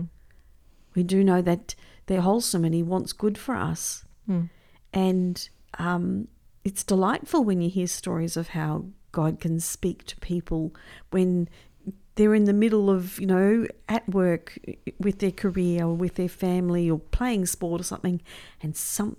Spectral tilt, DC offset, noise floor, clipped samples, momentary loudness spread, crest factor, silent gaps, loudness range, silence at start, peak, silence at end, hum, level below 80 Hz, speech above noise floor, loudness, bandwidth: -6 dB/octave; under 0.1%; -54 dBFS; under 0.1%; 14 LU; 16 dB; none; 5 LU; 0 s; -8 dBFS; 0.05 s; none; -44 dBFS; 29 dB; -26 LUFS; 16 kHz